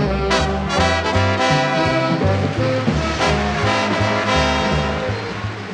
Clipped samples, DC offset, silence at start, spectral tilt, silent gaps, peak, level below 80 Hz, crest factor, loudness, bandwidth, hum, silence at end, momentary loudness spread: under 0.1%; under 0.1%; 0 s; -5 dB/octave; none; -4 dBFS; -30 dBFS; 14 dB; -18 LUFS; 11 kHz; none; 0 s; 4 LU